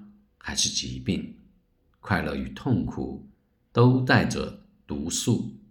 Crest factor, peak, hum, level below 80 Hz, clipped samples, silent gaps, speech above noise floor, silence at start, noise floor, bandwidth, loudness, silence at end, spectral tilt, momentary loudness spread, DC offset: 22 dB; -6 dBFS; none; -48 dBFS; under 0.1%; none; 40 dB; 0 s; -65 dBFS; 18 kHz; -26 LUFS; 0.15 s; -4.5 dB/octave; 16 LU; under 0.1%